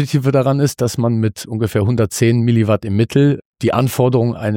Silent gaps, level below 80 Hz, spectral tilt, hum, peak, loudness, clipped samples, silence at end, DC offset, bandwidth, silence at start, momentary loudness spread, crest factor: 3.45-3.53 s; -48 dBFS; -7 dB/octave; none; -2 dBFS; -16 LUFS; under 0.1%; 0 s; under 0.1%; 17 kHz; 0 s; 5 LU; 14 dB